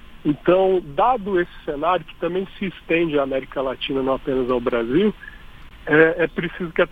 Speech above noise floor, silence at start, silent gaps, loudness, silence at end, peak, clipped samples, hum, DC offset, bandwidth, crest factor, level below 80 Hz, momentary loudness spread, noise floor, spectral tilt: 20 dB; 0.05 s; none; -21 LUFS; 0.05 s; -2 dBFS; under 0.1%; none; under 0.1%; 4.9 kHz; 20 dB; -44 dBFS; 10 LU; -40 dBFS; -8 dB/octave